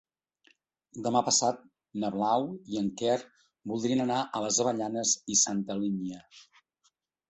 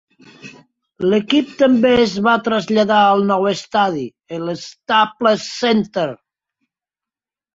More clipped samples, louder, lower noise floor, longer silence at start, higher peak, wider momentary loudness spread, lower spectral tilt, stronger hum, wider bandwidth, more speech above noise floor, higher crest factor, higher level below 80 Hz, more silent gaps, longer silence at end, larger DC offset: neither; second, -29 LUFS vs -16 LUFS; second, -74 dBFS vs -89 dBFS; first, 0.95 s vs 0.45 s; second, -10 dBFS vs -2 dBFS; about the same, 14 LU vs 12 LU; second, -3 dB/octave vs -5 dB/octave; neither; about the same, 8.4 kHz vs 7.8 kHz; second, 44 dB vs 73 dB; first, 22 dB vs 16 dB; second, -70 dBFS vs -56 dBFS; neither; second, 0.85 s vs 1.4 s; neither